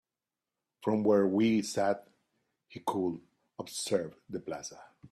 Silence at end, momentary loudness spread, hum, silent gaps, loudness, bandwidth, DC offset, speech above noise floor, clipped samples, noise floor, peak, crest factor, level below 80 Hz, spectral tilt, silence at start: 0.05 s; 19 LU; none; none; -32 LUFS; 13.5 kHz; under 0.1%; over 59 dB; under 0.1%; under -90 dBFS; -14 dBFS; 18 dB; -74 dBFS; -5 dB/octave; 0.8 s